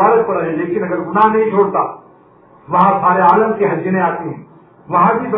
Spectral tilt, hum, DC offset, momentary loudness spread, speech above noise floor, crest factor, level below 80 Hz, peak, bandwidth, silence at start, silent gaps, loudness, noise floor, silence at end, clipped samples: -11 dB/octave; none; under 0.1%; 8 LU; 32 dB; 14 dB; -58 dBFS; 0 dBFS; 5.4 kHz; 0 s; none; -14 LUFS; -46 dBFS; 0 s; under 0.1%